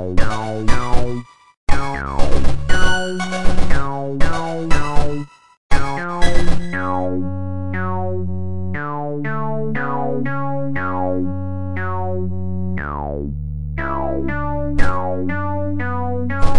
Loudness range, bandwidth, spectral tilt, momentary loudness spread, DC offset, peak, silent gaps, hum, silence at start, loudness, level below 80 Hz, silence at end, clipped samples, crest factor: 2 LU; 10.5 kHz; -6 dB/octave; 4 LU; 5%; 0 dBFS; 1.57-1.67 s, 5.57-5.70 s; none; 0 s; -23 LUFS; -24 dBFS; 0 s; under 0.1%; 14 dB